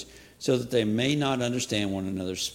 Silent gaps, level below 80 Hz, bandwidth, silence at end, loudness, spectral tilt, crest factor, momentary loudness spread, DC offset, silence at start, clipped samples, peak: none; -58 dBFS; 16.5 kHz; 0 s; -27 LUFS; -4.5 dB/octave; 16 dB; 7 LU; under 0.1%; 0 s; under 0.1%; -10 dBFS